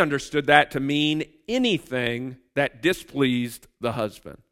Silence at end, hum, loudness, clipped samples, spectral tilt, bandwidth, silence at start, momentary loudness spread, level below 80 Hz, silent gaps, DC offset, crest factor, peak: 0.15 s; none; -24 LUFS; under 0.1%; -5 dB/octave; 16 kHz; 0 s; 13 LU; -56 dBFS; none; under 0.1%; 24 dB; 0 dBFS